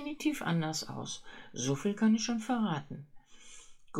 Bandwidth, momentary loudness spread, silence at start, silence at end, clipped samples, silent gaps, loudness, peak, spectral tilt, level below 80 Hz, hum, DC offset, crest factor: 14 kHz; 20 LU; 0 s; 0 s; under 0.1%; none; -33 LUFS; -18 dBFS; -5 dB/octave; -62 dBFS; none; under 0.1%; 16 dB